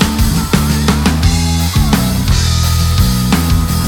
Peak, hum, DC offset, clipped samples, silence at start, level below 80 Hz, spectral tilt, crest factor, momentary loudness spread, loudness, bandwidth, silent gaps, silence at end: 0 dBFS; none; under 0.1%; under 0.1%; 0 s; -18 dBFS; -5 dB/octave; 12 dB; 1 LU; -13 LUFS; 18.5 kHz; none; 0 s